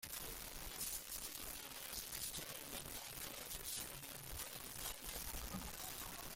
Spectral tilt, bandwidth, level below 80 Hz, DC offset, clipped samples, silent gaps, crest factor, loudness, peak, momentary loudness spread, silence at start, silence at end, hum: -1.5 dB/octave; 17 kHz; -60 dBFS; under 0.1%; under 0.1%; none; 20 dB; -47 LUFS; -30 dBFS; 4 LU; 0 s; 0 s; none